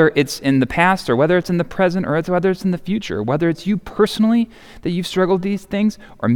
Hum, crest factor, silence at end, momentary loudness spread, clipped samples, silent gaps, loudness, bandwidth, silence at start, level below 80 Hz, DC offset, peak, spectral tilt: none; 16 dB; 0 s; 7 LU; under 0.1%; none; -18 LUFS; 17.5 kHz; 0 s; -46 dBFS; under 0.1%; -2 dBFS; -6.5 dB/octave